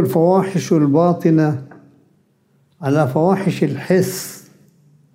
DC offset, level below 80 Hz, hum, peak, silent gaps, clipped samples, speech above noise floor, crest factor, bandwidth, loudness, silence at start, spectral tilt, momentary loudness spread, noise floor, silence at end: under 0.1%; -64 dBFS; none; -2 dBFS; none; under 0.1%; 43 dB; 16 dB; 16 kHz; -17 LUFS; 0 s; -7 dB/octave; 11 LU; -59 dBFS; 0.75 s